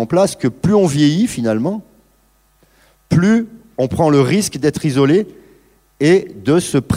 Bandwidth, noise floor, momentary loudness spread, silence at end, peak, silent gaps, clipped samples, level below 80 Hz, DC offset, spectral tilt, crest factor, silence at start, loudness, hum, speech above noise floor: 16 kHz; -56 dBFS; 7 LU; 0 s; -2 dBFS; none; under 0.1%; -46 dBFS; under 0.1%; -6 dB/octave; 14 dB; 0 s; -15 LUFS; none; 42 dB